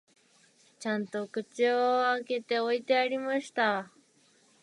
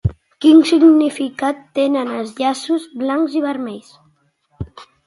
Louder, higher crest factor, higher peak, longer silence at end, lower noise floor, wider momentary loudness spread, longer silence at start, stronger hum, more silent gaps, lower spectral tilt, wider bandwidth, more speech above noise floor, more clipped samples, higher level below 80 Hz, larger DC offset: second, -29 LUFS vs -16 LUFS; about the same, 16 dB vs 16 dB; second, -14 dBFS vs 0 dBFS; first, 0.75 s vs 0.25 s; first, -65 dBFS vs -60 dBFS; second, 9 LU vs 22 LU; first, 0.8 s vs 0.05 s; neither; neither; second, -4 dB/octave vs -6.5 dB/octave; about the same, 11.5 kHz vs 11.5 kHz; second, 36 dB vs 45 dB; neither; second, -86 dBFS vs -42 dBFS; neither